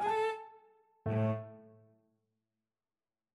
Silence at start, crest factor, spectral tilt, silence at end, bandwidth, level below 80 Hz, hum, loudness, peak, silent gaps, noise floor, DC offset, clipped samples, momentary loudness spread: 0 s; 16 dB; -7.5 dB/octave; 1.65 s; 11 kHz; -70 dBFS; none; -36 LUFS; -22 dBFS; none; under -90 dBFS; under 0.1%; under 0.1%; 21 LU